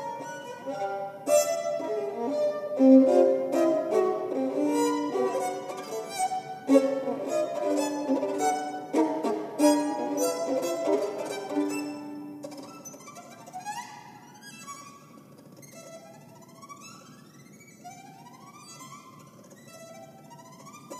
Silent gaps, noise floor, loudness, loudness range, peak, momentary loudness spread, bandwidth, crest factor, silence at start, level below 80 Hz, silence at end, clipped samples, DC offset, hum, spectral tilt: none; -51 dBFS; -27 LUFS; 24 LU; -8 dBFS; 24 LU; 15 kHz; 22 dB; 0 s; -84 dBFS; 0 s; under 0.1%; under 0.1%; none; -4 dB/octave